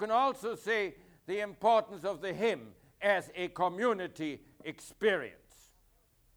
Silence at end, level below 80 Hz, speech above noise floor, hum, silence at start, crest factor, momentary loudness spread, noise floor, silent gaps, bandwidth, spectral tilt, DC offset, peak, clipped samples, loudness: 1.05 s; -70 dBFS; 36 dB; none; 0 s; 18 dB; 15 LU; -68 dBFS; none; over 20 kHz; -4.5 dB/octave; under 0.1%; -16 dBFS; under 0.1%; -33 LUFS